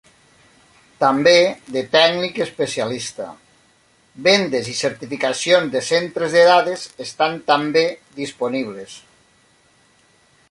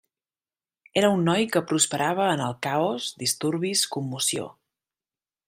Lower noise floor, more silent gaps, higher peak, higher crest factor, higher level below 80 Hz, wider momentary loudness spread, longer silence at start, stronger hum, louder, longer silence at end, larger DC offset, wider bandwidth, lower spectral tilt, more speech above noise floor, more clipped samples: second, -57 dBFS vs under -90 dBFS; neither; first, 0 dBFS vs -4 dBFS; about the same, 20 dB vs 22 dB; about the same, -64 dBFS vs -68 dBFS; first, 16 LU vs 6 LU; about the same, 1 s vs 0.95 s; neither; first, -18 LUFS vs -24 LUFS; first, 1.5 s vs 0.95 s; neither; second, 11.5 kHz vs 16 kHz; about the same, -3.5 dB/octave vs -3.5 dB/octave; second, 39 dB vs over 66 dB; neither